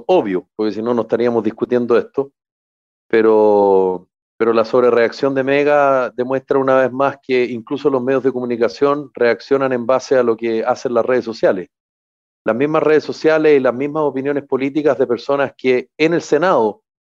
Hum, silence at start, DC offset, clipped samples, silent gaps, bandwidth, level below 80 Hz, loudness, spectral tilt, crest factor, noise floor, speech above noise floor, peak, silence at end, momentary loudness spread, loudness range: none; 0.1 s; under 0.1%; under 0.1%; 2.52-3.09 s, 4.22-4.38 s, 11.80-12.45 s; 7.6 kHz; -66 dBFS; -16 LUFS; -6.5 dB/octave; 12 dB; under -90 dBFS; over 75 dB; -4 dBFS; 0.45 s; 7 LU; 3 LU